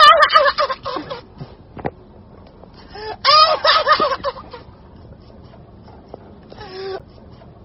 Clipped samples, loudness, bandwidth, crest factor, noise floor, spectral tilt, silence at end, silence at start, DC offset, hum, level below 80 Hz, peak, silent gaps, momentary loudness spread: under 0.1%; -14 LUFS; 6.2 kHz; 18 dB; -42 dBFS; 1 dB/octave; 0.65 s; 0 s; under 0.1%; none; -48 dBFS; 0 dBFS; none; 27 LU